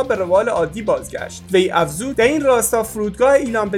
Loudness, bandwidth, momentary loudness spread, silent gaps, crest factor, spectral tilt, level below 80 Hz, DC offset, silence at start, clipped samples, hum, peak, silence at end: -17 LUFS; 17.5 kHz; 7 LU; none; 16 dB; -4 dB/octave; -44 dBFS; under 0.1%; 0 s; under 0.1%; none; 0 dBFS; 0 s